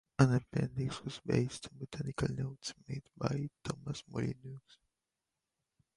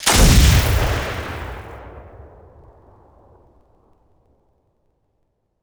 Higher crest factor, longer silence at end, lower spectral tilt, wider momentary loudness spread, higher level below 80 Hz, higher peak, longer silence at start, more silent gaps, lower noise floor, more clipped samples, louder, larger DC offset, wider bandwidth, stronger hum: first, 24 dB vs 18 dB; second, 1.35 s vs 3.6 s; first, -6.5 dB/octave vs -4 dB/octave; second, 15 LU vs 26 LU; second, -60 dBFS vs -24 dBFS; second, -14 dBFS vs -2 dBFS; first, 0.2 s vs 0 s; neither; first, -89 dBFS vs -68 dBFS; neither; second, -37 LUFS vs -16 LUFS; neither; second, 11.5 kHz vs over 20 kHz; neither